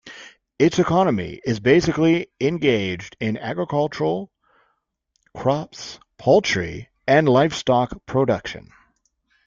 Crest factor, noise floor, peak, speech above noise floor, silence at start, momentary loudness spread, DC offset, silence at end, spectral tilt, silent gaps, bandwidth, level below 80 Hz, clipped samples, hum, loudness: 18 dB; -72 dBFS; -4 dBFS; 52 dB; 0.05 s; 15 LU; under 0.1%; 0.9 s; -6 dB/octave; none; 7.6 kHz; -52 dBFS; under 0.1%; none; -20 LUFS